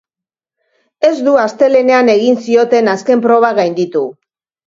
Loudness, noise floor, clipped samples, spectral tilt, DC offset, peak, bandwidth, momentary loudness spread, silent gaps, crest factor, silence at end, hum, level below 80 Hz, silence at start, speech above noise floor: -11 LUFS; -87 dBFS; under 0.1%; -5.5 dB/octave; under 0.1%; 0 dBFS; 7.6 kHz; 6 LU; none; 12 dB; 0.55 s; none; -60 dBFS; 1 s; 76 dB